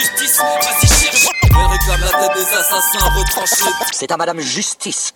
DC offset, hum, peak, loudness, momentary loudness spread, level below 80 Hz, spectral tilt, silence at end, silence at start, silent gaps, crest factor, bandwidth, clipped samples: under 0.1%; none; 0 dBFS; -13 LUFS; 8 LU; -20 dBFS; -2.5 dB/octave; 0.05 s; 0 s; none; 14 dB; over 20 kHz; under 0.1%